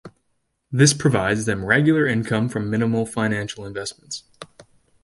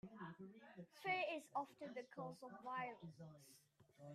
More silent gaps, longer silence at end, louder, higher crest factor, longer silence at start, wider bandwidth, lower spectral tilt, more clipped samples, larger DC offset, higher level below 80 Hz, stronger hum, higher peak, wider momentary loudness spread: neither; first, 0.4 s vs 0 s; first, -20 LUFS vs -49 LUFS; about the same, 20 dB vs 20 dB; about the same, 0.05 s vs 0.05 s; second, 11.5 kHz vs 15.5 kHz; about the same, -5 dB/octave vs -5 dB/octave; neither; neither; first, -52 dBFS vs -90 dBFS; neither; first, -2 dBFS vs -30 dBFS; second, 14 LU vs 19 LU